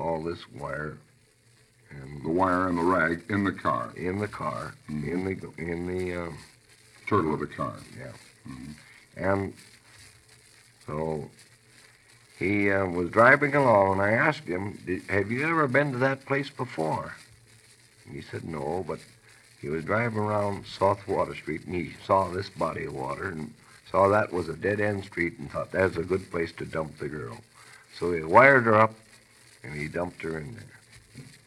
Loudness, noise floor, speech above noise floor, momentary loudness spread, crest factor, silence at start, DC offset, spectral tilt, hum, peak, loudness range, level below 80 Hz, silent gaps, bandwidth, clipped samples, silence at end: -27 LUFS; -61 dBFS; 34 dB; 20 LU; 26 dB; 0 s; under 0.1%; -6.5 dB/octave; none; -2 dBFS; 12 LU; -58 dBFS; none; 13 kHz; under 0.1%; 0.2 s